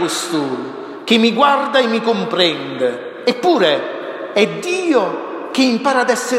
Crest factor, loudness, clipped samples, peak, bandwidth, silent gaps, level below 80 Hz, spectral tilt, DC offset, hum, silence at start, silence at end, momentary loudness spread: 16 dB; -16 LUFS; under 0.1%; 0 dBFS; 15.5 kHz; none; -68 dBFS; -3.5 dB/octave; under 0.1%; none; 0 s; 0 s; 10 LU